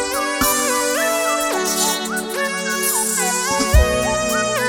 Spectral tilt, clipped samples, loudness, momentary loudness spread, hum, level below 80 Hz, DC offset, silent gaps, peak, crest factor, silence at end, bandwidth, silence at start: -2.5 dB/octave; under 0.1%; -18 LUFS; 5 LU; none; -26 dBFS; under 0.1%; none; -2 dBFS; 18 dB; 0 s; over 20 kHz; 0 s